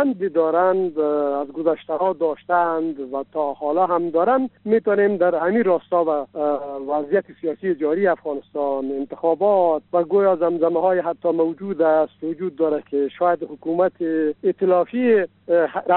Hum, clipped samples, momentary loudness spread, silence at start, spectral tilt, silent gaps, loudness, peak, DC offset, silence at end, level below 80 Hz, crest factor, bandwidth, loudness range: none; under 0.1%; 7 LU; 0 s; -6 dB/octave; none; -21 LUFS; -6 dBFS; under 0.1%; 0 s; -68 dBFS; 14 dB; 4.2 kHz; 2 LU